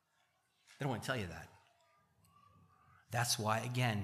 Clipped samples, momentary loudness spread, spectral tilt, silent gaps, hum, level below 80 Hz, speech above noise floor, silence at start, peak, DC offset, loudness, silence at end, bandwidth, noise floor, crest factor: under 0.1%; 14 LU; -4 dB/octave; none; none; -72 dBFS; 41 dB; 0.7 s; -20 dBFS; under 0.1%; -38 LUFS; 0 s; 15 kHz; -78 dBFS; 22 dB